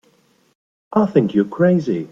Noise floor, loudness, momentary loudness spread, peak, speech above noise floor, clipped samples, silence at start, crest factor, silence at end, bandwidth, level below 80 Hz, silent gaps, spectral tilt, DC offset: -58 dBFS; -17 LUFS; 3 LU; -2 dBFS; 42 dB; under 0.1%; 0.9 s; 16 dB; 0.05 s; 7.2 kHz; -60 dBFS; none; -9 dB/octave; under 0.1%